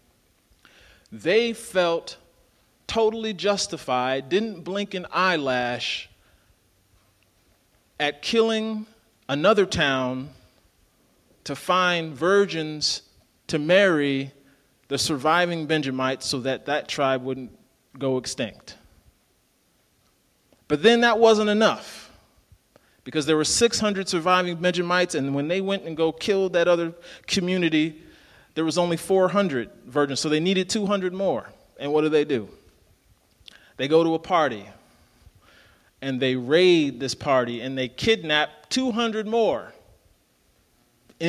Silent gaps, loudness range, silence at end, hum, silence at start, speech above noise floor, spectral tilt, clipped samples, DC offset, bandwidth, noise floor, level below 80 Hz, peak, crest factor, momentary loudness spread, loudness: none; 5 LU; 0 s; none; 1.1 s; 42 dB; -4 dB/octave; under 0.1%; under 0.1%; 14.5 kHz; -65 dBFS; -58 dBFS; -4 dBFS; 20 dB; 12 LU; -23 LUFS